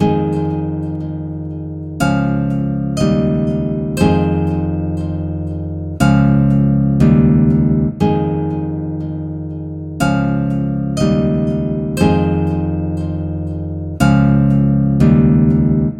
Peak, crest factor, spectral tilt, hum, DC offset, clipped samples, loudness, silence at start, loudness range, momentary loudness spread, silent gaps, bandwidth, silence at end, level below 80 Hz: 0 dBFS; 14 dB; -8.5 dB/octave; none; under 0.1%; under 0.1%; -16 LUFS; 0 s; 5 LU; 12 LU; none; 12 kHz; 0 s; -30 dBFS